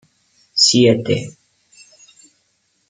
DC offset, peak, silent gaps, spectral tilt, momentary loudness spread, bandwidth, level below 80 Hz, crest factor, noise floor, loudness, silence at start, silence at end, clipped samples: under 0.1%; 0 dBFS; none; -4 dB/octave; 13 LU; 9.6 kHz; -58 dBFS; 18 dB; -65 dBFS; -14 LUFS; 0.55 s; 1.6 s; under 0.1%